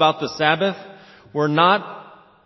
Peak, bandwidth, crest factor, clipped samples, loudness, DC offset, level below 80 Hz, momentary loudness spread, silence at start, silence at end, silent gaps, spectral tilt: 0 dBFS; 6.2 kHz; 20 dB; under 0.1%; -19 LUFS; under 0.1%; -64 dBFS; 20 LU; 0 s; 0.45 s; none; -5.5 dB/octave